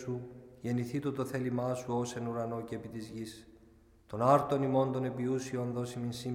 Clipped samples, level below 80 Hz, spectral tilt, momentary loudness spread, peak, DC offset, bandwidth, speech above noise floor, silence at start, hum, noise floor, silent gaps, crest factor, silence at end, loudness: under 0.1%; -66 dBFS; -7 dB/octave; 16 LU; -12 dBFS; under 0.1%; 16 kHz; 28 dB; 0 s; none; -61 dBFS; none; 22 dB; 0 s; -34 LUFS